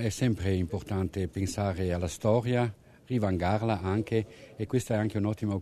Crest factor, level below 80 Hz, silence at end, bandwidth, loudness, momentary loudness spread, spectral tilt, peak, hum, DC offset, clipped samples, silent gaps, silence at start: 18 dB; -54 dBFS; 0 s; 13.5 kHz; -30 LUFS; 5 LU; -6.5 dB/octave; -12 dBFS; none; under 0.1%; under 0.1%; none; 0 s